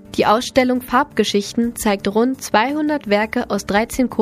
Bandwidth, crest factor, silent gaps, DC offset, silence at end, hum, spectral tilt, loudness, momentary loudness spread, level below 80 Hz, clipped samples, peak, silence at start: 15.5 kHz; 18 dB; none; under 0.1%; 0 s; none; -4 dB/octave; -18 LUFS; 4 LU; -44 dBFS; under 0.1%; 0 dBFS; 0.05 s